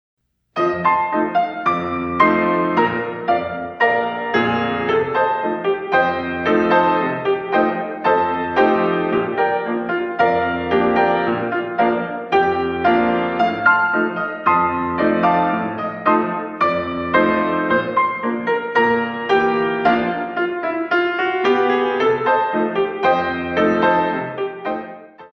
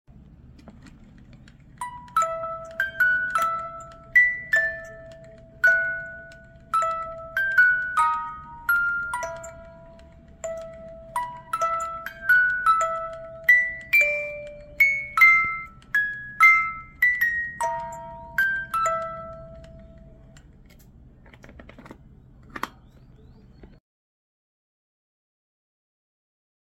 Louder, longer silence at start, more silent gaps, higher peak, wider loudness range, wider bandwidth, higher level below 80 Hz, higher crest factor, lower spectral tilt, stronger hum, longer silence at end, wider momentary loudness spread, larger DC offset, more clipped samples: first, -18 LUFS vs -21 LUFS; about the same, 0.55 s vs 0.45 s; neither; first, 0 dBFS vs -6 dBFS; second, 1 LU vs 24 LU; second, 6.6 kHz vs 16.5 kHz; about the same, -52 dBFS vs -52 dBFS; about the same, 18 dB vs 20 dB; first, -7 dB/octave vs -2.5 dB/octave; neither; second, 0.05 s vs 3.1 s; second, 6 LU vs 20 LU; neither; neither